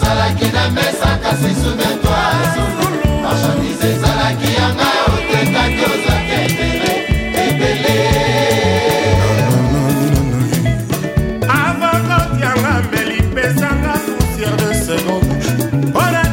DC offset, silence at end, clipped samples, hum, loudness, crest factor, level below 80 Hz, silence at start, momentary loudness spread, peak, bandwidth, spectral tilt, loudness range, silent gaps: under 0.1%; 0 s; under 0.1%; none; -14 LUFS; 12 dB; -26 dBFS; 0 s; 3 LU; -2 dBFS; 16.5 kHz; -5 dB/octave; 2 LU; none